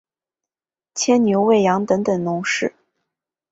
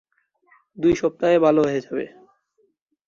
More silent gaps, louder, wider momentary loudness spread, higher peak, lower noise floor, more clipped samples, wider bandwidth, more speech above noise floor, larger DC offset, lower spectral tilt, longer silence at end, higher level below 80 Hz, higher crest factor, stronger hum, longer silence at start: neither; about the same, -18 LUFS vs -20 LUFS; second, 8 LU vs 14 LU; about the same, -4 dBFS vs -4 dBFS; first, under -90 dBFS vs -66 dBFS; neither; first, 8.2 kHz vs 7.4 kHz; first, over 73 dB vs 47 dB; neither; second, -4.5 dB/octave vs -6.5 dB/octave; second, 0.8 s vs 1 s; second, -62 dBFS vs -54 dBFS; about the same, 16 dB vs 18 dB; neither; first, 0.95 s vs 0.8 s